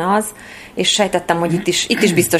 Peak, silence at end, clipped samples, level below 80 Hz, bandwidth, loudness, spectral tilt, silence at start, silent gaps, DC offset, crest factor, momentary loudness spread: 0 dBFS; 0 s; under 0.1%; -50 dBFS; 15.5 kHz; -16 LUFS; -3.5 dB/octave; 0 s; none; under 0.1%; 16 dB; 13 LU